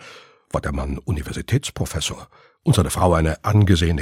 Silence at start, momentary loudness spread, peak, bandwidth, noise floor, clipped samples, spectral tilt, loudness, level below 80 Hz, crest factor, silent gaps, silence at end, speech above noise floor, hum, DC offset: 0 s; 10 LU; -2 dBFS; 16 kHz; -45 dBFS; under 0.1%; -5.5 dB/octave; -21 LUFS; -32 dBFS; 18 dB; none; 0 s; 25 dB; none; under 0.1%